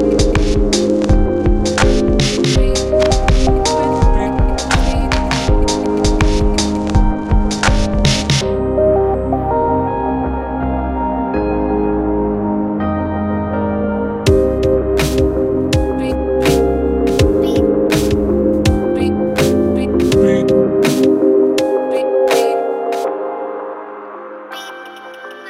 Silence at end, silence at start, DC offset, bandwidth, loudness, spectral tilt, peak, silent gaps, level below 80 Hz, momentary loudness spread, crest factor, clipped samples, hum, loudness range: 0 s; 0 s; under 0.1%; 16 kHz; -15 LUFS; -5.5 dB/octave; 0 dBFS; none; -20 dBFS; 6 LU; 14 dB; under 0.1%; none; 4 LU